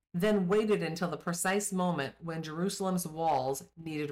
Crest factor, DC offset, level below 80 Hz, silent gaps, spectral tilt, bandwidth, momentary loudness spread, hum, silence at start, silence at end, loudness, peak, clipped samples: 12 dB; under 0.1%; -64 dBFS; none; -5 dB/octave; 16 kHz; 10 LU; none; 0.15 s; 0 s; -32 LUFS; -20 dBFS; under 0.1%